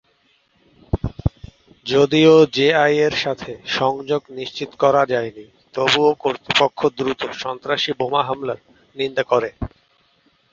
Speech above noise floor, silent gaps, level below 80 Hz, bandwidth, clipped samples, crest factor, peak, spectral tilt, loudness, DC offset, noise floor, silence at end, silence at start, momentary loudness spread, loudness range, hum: 43 dB; none; -42 dBFS; 7.6 kHz; under 0.1%; 18 dB; -2 dBFS; -5 dB/octave; -19 LUFS; under 0.1%; -61 dBFS; 0.85 s; 0.95 s; 15 LU; 5 LU; none